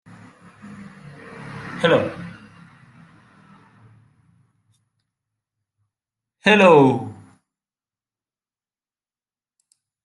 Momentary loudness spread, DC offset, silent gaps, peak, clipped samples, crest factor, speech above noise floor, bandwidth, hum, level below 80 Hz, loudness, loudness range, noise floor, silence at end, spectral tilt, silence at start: 29 LU; under 0.1%; none; -2 dBFS; under 0.1%; 22 dB; over 76 dB; 11 kHz; none; -64 dBFS; -16 LUFS; 7 LU; under -90 dBFS; 2.9 s; -6 dB/octave; 1.4 s